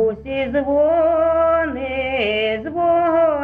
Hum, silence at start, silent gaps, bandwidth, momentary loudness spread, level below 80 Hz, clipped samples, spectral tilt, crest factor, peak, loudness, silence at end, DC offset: none; 0 s; none; 4.6 kHz; 6 LU; -42 dBFS; under 0.1%; -7.5 dB/octave; 12 dB; -6 dBFS; -18 LUFS; 0 s; under 0.1%